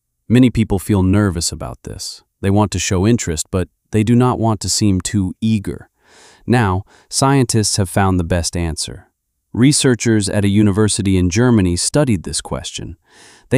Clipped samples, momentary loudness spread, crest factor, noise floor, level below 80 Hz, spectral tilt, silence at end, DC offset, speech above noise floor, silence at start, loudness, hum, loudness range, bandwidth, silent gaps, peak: under 0.1%; 13 LU; 14 dB; -47 dBFS; -36 dBFS; -5 dB/octave; 0 s; under 0.1%; 32 dB; 0.3 s; -16 LUFS; none; 3 LU; 15.5 kHz; none; -2 dBFS